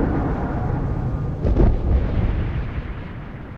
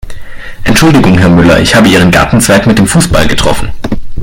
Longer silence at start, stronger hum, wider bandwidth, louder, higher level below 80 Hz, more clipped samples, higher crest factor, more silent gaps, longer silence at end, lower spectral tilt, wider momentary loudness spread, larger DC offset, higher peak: about the same, 0 s vs 0.05 s; neither; second, 5.2 kHz vs 17 kHz; second, -23 LUFS vs -6 LUFS; about the same, -24 dBFS vs -20 dBFS; second, under 0.1% vs 3%; first, 16 dB vs 6 dB; neither; about the same, 0 s vs 0 s; first, -10 dB/octave vs -5 dB/octave; about the same, 13 LU vs 12 LU; neither; second, -6 dBFS vs 0 dBFS